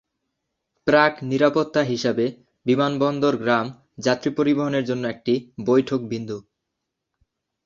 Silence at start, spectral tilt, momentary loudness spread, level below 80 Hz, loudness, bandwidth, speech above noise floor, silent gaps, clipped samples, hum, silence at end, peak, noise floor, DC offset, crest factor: 0.85 s; -6 dB/octave; 10 LU; -62 dBFS; -22 LUFS; 7.4 kHz; 60 dB; none; under 0.1%; none; 1.25 s; -2 dBFS; -81 dBFS; under 0.1%; 22 dB